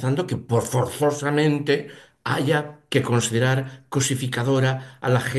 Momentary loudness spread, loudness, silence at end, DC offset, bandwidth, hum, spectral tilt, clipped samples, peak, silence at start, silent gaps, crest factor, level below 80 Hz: 5 LU; -23 LUFS; 0 s; under 0.1%; 12.5 kHz; none; -5 dB/octave; under 0.1%; -6 dBFS; 0 s; none; 16 dB; -54 dBFS